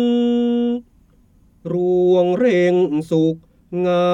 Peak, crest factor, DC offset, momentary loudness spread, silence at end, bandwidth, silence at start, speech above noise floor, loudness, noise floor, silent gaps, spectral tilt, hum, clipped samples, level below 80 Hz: -6 dBFS; 12 dB; under 0.1%; 12 LU; 0 s; 7.6 kHz; 0 s; 37 dB; -18 LUFS; -53 dBFS; none; -8 dB/octave; none; under 0.1%; -56 dBFS